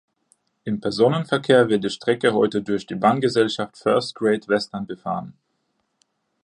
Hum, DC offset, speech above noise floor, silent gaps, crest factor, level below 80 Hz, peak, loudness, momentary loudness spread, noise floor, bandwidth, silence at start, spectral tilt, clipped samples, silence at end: none; under 0.1%; 51 dB; none; 20 dB; -62 dBFS; -2 dBFS; -21 LUFS; 12 LU; -72 dBFS; 10.5 kHz; 0.65 s; -6 dB/octave; under 0.1%; 1.15 s